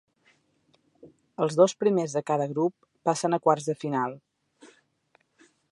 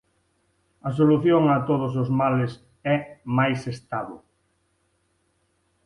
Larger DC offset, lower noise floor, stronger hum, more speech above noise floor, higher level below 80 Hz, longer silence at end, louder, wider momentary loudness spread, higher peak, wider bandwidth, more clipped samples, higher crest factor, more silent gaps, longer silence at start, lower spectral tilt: neither; about the same, -68 dBFS vs -69 dBFS; neither; second, 43 dB vs 47 dB; second, -80 dBFS vs -60 dBFS; second, 1.05 s vs 1.7 s; second, -26 LUFS vs -23 LUFS; second, 9 LU vs 13 LU; about the same, -6 dBFS vs -8 dBFS; about the same, 11.5 kHz vs 11 kHz; neither; about the same, 22 dB vs 18 dB; neither; first, 1.05 s vs 0.85 s; second, -5.5 dB/octave vs -8.5 dB/octave